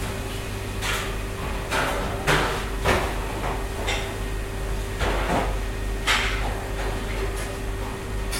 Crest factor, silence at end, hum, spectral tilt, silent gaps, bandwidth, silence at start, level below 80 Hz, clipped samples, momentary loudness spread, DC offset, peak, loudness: 20 dB; 0 s; none; -4 dB/octave; none; 16.5 kHz; 0 s; -30 dBFS; under 0.1%; 9 LU; under 0.1%; -6 dBFS; -26 LUFS